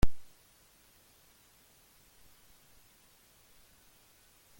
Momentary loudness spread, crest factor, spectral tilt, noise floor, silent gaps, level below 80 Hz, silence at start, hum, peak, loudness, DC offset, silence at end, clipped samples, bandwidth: 0 LU; 24 dB; -5.5 dB/octave; -64 dBFS; none; -44 dBFS; 0.05 s; none; -10 dBFS; -54 LUFS; under 0.1%; 4.4 s; under 0.1%; 17 kHz